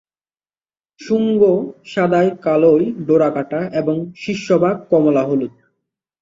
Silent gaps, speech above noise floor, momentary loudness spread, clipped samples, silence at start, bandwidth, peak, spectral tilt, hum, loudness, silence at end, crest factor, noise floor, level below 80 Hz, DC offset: none; over 74 dB; 9 LU; under 0.1%; 1 s; 7.6 kHz; -2 dBFS; -7.5 dB/octave; none; -16 LUFS; 0.7 s; 16 dB; under -90 dBFS; -60 dBFS; under 0.1%